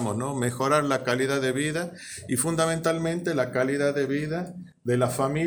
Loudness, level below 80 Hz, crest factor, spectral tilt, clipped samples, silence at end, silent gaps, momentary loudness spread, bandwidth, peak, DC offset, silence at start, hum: -26 LUFS; -60 dBFS; 18 dB; -5 dB/octave; under 0.1%; 0 s; none; 8 LU; over 20 kHz; -8 dBFS; under 0.1%; 0 s; none